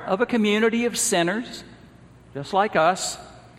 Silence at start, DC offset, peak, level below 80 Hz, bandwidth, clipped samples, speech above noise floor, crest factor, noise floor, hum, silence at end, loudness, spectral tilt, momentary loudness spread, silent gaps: 0 s; under 0.1%; -6 dBFS; -58 dBFS; 16 kHz; under 0.1%; 26 dB; 18 dB; -48 dBFS; none; 0.1 s; -22 LUFS; -3.5 dB/octave; 17 LU; none